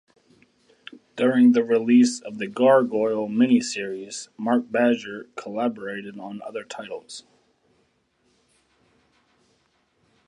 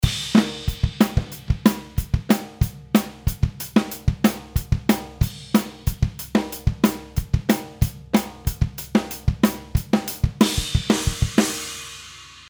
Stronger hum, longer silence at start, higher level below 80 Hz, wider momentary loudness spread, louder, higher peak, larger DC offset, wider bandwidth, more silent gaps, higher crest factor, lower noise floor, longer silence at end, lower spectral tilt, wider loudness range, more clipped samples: neither; first, 1.15 s vs 0 s; second, -76 dBFS vs -30 dBFS; first, 18 LU vs 7 LU; about the same, -22 LUFS vs -23 LUFS; second, -6 dBFS vs -2 dBFS; neither; second, 10.5 kHz vs over 20 kHz; neither; about the same, 18 dB vs 20 dB; first, -67 dBFS vs -42 dBFS; first, 3.1 s vs 0.1 s; about the same, -5 dB/octave vs -5.5 dB/octave; first, 19 LU vs 2 LU; neither